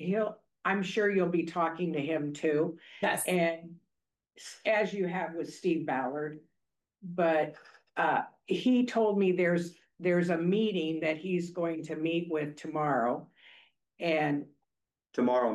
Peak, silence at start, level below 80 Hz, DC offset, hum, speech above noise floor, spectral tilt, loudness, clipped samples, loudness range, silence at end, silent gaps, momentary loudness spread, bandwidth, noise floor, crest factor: -16 dBFS; 0 s; -80 dBFS; under 0.1%; none; 57 dB; -6 dB/octave; -31 LUFS; under 0.1%; 4 LU; 0 s; none; 10 LU; 12.5 kHz; -87 dBFS; 14 dB